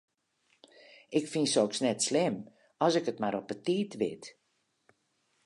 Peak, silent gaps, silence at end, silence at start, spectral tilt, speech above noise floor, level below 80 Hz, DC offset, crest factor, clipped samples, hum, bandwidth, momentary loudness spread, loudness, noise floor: -12 dBFS; none; 1.15 s; 1.1 s; -4 dB/octave; 47 dB; -78 dBFS; under 0.1%; 20 dB; under 0.1%; none; 11.5 kHz; 8 LU; -31 LUFS; -77 dBFS